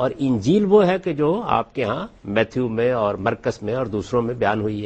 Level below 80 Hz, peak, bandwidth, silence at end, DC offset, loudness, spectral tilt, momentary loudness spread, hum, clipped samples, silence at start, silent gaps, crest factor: -50 dBFS; -4 dBFS; 8.6 kHz; 0 s; under 0.1%; -21 LUFS; -7 dB/octave; 9 LU; none; under 0.1%; 0 s; none; 16 dB